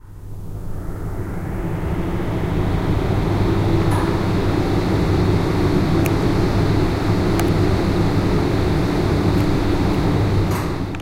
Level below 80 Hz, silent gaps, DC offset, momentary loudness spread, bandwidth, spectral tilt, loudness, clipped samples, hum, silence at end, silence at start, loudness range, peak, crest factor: -26 dBFS; none; under 0.1%; 9 LU; 16 kHz; -7.5 dB/octave; -19 LUFS; under 0.1%; none; 0 s; 0.05 s; 3 LU; -4 dBFS; 14 dB